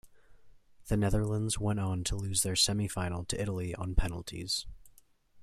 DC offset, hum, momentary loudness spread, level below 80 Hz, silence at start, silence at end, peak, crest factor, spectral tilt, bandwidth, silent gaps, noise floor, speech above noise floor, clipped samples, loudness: under 0.1%; none; 8 LU; -42 dBFS; 0.05 s; 0 s; -12 dBFS; 22 dB; -4 dB/octave; 15.5 kHz; none; -61 dBFS; 30 dB; under 0.1%; -32 LUFS